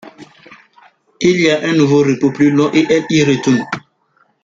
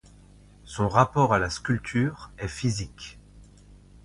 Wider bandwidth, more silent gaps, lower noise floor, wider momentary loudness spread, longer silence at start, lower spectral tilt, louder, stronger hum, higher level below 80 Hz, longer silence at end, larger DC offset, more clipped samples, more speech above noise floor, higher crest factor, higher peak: second, 7.6 kHz vs 11.5 kHz; neither; first, -58 dBFS vs -52 dBFS; second, 5 LU vs 18 LU; second, 0.05 s vs 0.65 s; about the same, -5.5 dB/octave vs -6 dB/octave; first, -13 LUFS vs -26 LUFS; neither; second, -54 dBFS vs -48 dBFS; first, 0.65 s vs 0.3 s; neither; neither; first, 46 dB vs 27 dB; second, 14 dB vs 24 dB; about the same, -2 dBFS vs -4 dBFS